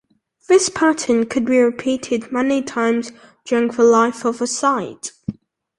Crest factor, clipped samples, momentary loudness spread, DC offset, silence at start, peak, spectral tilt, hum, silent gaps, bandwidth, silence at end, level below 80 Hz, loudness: 16 dB; under 0.1%; 15 LU; under 0.1%; 0.5 s; -2 dBFS; -3.5 dB/octave; none; none; 11.5 kHz; 0.45 s; -58 dBFS; -18 LUFS